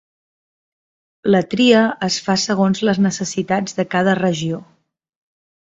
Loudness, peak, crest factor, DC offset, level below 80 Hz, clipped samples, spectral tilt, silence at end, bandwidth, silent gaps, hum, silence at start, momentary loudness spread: -17 LUFS; 0 dBFS; 18 dB; under 0.1%; -58 dBFS; under 0.1%; -5 dB/octave; 1.2 s; 8 kHz; none; none; 1.25 s; 10 LU